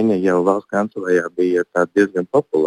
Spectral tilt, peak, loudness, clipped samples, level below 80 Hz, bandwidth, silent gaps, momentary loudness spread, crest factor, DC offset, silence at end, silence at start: -7 dB/octave; -2 dBFS; -18 LUFS; under 0.1%; -66 dBFS; 10.5 kHz; none; 3 LU; 14 dB; under 0.1%; 0 s; 0 s